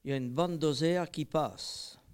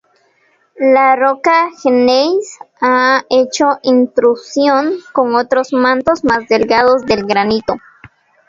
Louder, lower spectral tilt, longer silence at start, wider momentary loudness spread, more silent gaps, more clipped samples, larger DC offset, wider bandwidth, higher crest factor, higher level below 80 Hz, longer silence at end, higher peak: second, -33 LUFS vs -12 LUFS; first, -5.5 dB/octave vs -4 dB/octave; second, 0.05 s vs 0.8 s; first, 10 LU vs 6 LU; neither; neither; neither; first, 17 kHz vs 7.8 kHz; about the same, 16 dB vs 12 dB; second, -64 dBFS vs -50 dBFS; second, 0.2 s vs 0.7 s; second, -16 dBFS vs 0 dBFS